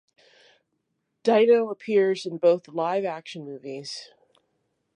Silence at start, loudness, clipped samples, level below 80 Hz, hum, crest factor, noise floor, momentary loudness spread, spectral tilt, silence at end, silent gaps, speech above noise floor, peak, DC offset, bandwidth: 1.25 s; -23 LUFS; under 0.1%; -84 dBFS; none; 18 dB; -77 dBFS; 17 LU; -5.5 dB/octave; 0.9 s; none; 53 dB; -8 dBFS; under 0.1%; 10 kHz